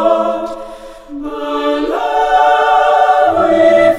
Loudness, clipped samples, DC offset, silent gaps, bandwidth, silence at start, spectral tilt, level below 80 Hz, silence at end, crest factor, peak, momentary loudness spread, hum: -12 LUFS; under 0.1%; under 0.1%; none; 12.5 kHz; 0 s; -4.5 dB/octave; -42 dBFS; 0 s; 12 dB; 0 dBFS; 16 LU; none